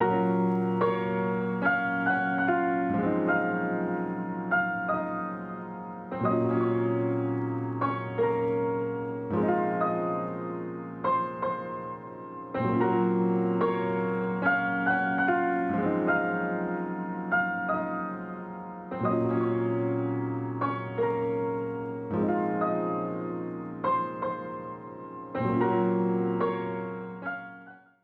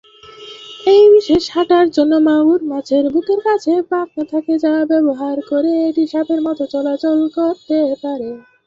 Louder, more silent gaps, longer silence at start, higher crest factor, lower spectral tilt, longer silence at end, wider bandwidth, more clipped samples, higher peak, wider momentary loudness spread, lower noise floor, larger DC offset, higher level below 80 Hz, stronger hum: second, -29 LUFS vs -15 LUFS; neither; second, 0 s vs 0.25 s; about the same, 16 dB vs 12 dB; first, -10 dB/octave vs -5.5 dB/octave; about the same, 0.25 s vs 0.25 s; second, 4.6 kHz vs 7.6 kHz; neither; second, -12 dBFS vs -2 dBFS; about the same, 11 LU vs 9 LU; first, -50 dBFS vs -37 dBFS; neither; second, -64 dBFS vs -54 dBFS; neither